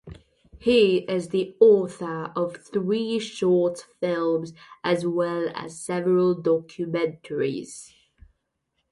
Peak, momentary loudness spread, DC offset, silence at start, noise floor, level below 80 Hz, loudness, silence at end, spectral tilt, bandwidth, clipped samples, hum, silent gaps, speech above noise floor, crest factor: -4 dBFS; 12 LU; under 0.1%; 0.05 s; -76 dBFS; -60 dBFS; -24 LUFS; 1.05 s; -6 dB/octave; 11.5 kHz; under 0.1%; none; none; 53 dB; 20 dB